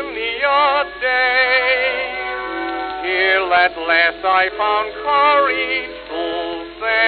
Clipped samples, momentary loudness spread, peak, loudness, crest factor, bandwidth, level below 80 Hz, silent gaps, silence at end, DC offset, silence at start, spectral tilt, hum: under 0.1%; 10 LU; -2 dBFS; -16 LUFS; 16 dB; 5 kHz; -48 dBFS; none; 0 s; under 0.1%; 0 s; -5.5 dB/octave; none